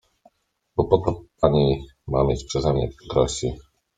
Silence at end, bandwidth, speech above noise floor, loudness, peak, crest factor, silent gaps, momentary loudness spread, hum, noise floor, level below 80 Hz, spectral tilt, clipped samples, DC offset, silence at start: 0.35 s; 9.4 kHz; 46 dB; -23 LUFS; -2 dBFS; 22 dB; none; 9 LU; none; -67 dBFS; -38 dBFS; -6.5 dB/octave; under 0.1%; under 0.1%; 0.75 s